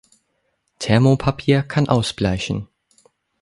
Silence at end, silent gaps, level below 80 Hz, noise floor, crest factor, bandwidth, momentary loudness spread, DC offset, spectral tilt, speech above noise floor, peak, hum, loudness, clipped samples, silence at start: 0.8 s; none; -42 dBFS; -69 dBFS; 20 dB; 11.5 kHz; 11 LU; under 0.1%; -6.5 dB/octave; 52 dB; -2 dBFS; none; -19 LUFS; under 0.1%; 0.8 s